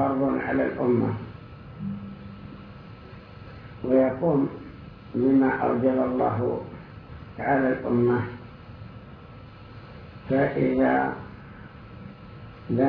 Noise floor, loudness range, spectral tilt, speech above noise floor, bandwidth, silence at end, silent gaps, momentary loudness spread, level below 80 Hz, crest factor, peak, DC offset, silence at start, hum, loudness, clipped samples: -44 dBFS; 5 LU; -11 dB/octave; 21 dB; 5.2 kHz; 0 s; none; 22 LU; -52 dBFS; 16 dB; -10 dBFS; under 0.1%; 0 s; none; -25 LUFS; under 0.1%